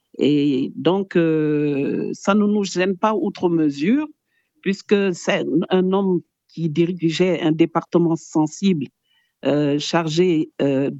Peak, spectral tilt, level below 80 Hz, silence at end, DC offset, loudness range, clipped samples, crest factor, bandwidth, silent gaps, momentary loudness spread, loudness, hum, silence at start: -4 dBFS; -6.5 dB/octave; -66 dBFS; 0 s; under 0.1%; 1 LU; under 0.1%; 16 dB; 8.2 kHz; none; 6 LU; -20 LUFS; none; 0.15 s